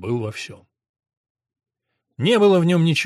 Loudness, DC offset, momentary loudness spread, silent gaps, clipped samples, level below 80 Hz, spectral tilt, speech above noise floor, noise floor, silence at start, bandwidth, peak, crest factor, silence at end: -18 LUFS; under 0.1%; 18 LU; 0.89-0.94 s, 1.17-1.24 s, 1.30-1.35 s; under 0.1%; -64 dBFS; -6 dB/octave; 59 dB; -77 dBFS; 0 s; 13 kHz; -6 dBFS; 14 dB; 0 s